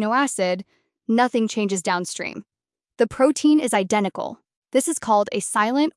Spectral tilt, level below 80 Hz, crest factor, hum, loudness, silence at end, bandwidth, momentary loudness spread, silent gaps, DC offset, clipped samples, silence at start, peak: -4 dB/octave; -64 dBFS; 16 dB; none; -21 LUFS; 0.05 s; 12 kHz; 12 LU; 4.57-4.62 s; under 0.1%; under 0.1%; 0 s; -6 dBFS